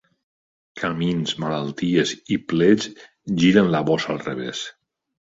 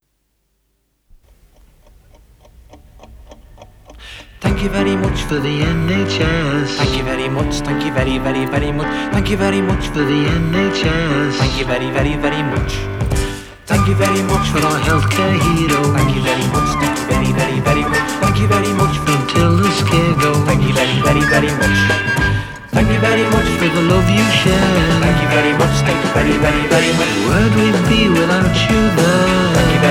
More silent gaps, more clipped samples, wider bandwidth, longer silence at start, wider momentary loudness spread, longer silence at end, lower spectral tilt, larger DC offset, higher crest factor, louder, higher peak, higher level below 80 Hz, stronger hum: neither; neither; second, 7.8 kHz vs 16.5 kHz; second, 0.75 s vs 2.75 s; first, 12 LU vs 6 LU; first, 0.55 s vs 0 s; about the same, -5.5 dB/octave vs -5.5 dB/octave; neither; first, 20 dB vs 14 dB; second, -21 LUFS vs -15 LUFS; about the same, -2 dBFS vs 0 dBFS; second, -56 dBFS vs -28 dBFS; neither